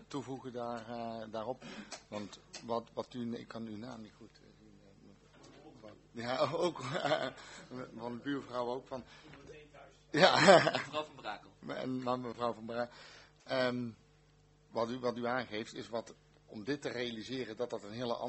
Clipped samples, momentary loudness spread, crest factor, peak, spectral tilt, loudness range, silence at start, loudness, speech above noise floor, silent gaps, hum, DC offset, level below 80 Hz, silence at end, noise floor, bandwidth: under 0.1%; 18 LU; 30 dB; -6 dBFS; -4.5 dB/octave; 14 LU; 0 s; -35 LUFS; 30 dB; none; 50 Hz at -65 dBFS; under 0.1%; -70 dBFS; 0 s; -66 dBFS; 8.2 kHz